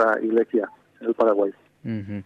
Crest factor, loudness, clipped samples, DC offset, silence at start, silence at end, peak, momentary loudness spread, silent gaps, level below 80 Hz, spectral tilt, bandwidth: 16 dB; -23 LUFS; under 0.1%; under 0.1%; 0 s; 0.05 s; -8 dBFS; 13 LU; none; -70 dBFS; -8.5 dB/octave; 5.6 kHz